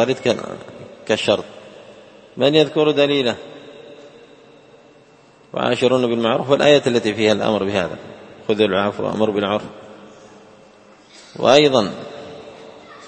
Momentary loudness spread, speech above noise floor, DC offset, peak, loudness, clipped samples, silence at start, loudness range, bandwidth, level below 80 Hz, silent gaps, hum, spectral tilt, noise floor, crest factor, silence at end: 24 LU; 32 dB; under 0.1%; 0 dBFS; -17 LUFS; under 0.1%; 0 s; 5 LU; 8.8 kHz; -60 dBFS; none; none; -5 dB/octave; -49 dBFS; 20 dB; 0 s